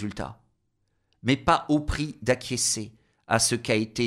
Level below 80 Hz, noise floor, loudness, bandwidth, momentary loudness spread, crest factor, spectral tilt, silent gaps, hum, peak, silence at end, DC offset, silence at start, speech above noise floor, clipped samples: -44 dBFS; -73 dBFS; -25 LUFS; 16 kHz; 12 LU; 20 dB; -3.5 dB/octave; none; none; -6 dBFS; 0 s; under 0.1%; 0 s; 47 dB; under 0.1%